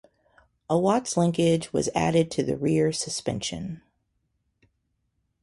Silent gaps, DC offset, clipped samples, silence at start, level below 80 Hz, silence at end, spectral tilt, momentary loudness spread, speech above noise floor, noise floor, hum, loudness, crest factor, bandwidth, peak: none; under 0.1%; under 0.1%; 0.7 s; -56 dBFS; 1.65 s; -5.5 dB/octave; 9 LU; 50 dB; -75 dBFS; none; -25 LUFS; 18 dB; 11.5 kHz; -8 dBFS